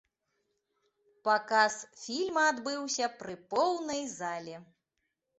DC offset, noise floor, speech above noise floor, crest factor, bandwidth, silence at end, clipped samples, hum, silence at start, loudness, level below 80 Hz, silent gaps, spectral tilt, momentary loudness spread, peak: under 0.1%; -84 dBFS; 52 dB; 20 dB; 8.4 kHz; 0.75 s; under 0.1%; none; 1.25 s; -31 LUFS; -78 dBFS; none; -2 dB/octave; 14 LU; -12 dBFS